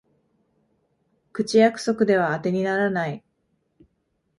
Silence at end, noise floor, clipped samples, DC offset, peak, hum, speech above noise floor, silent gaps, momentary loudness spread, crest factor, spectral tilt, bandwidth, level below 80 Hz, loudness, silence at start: 1.2 s; -72 dBFS; under 0.1%; under 0.1%; -6 dBFS; none; 51 dB; none; 12 LU; 18 dB; -6 dB/octave; 11.5 kHz; -66 dBFS; -22 LUFS; 1.35 s